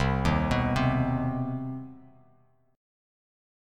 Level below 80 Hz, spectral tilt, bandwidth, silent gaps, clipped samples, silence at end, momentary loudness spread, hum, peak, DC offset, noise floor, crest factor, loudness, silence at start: -40 dBFS; -7.5 dB/octave; 10.5 kHz; none; under 0.1%; 1 s; 13 LU; none; -10 dBFS; under 0.1%; -64 dBFS; 18 dB; -28 LUFS; 0 s